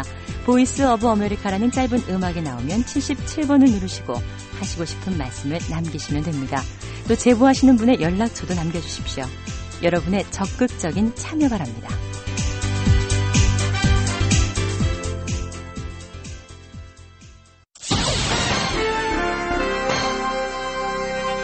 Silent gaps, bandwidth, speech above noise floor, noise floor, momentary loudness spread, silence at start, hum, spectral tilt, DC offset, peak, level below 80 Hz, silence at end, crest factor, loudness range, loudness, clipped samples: none; 8.8 kHz; 28 dB; -48 dBFS; 14 LU; 0 s; none; -5 dB/octave; under 0.1%; -4 dBFS; -32 dBFS; 0 s; 16 dB; 6 LU; -21 LUFS; under 0.1%